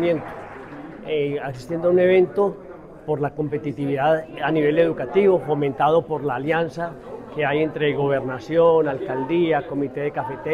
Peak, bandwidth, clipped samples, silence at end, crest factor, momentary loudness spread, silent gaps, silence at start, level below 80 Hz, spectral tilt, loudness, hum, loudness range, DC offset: -6 dBFS; 10 kHz; under 0.1%; 0 s; 16 dB; 16 LU; none; 0 s; -54 dBFS; -8 dB/octave; -21 LUFS; none; 2 LU; under 0.1%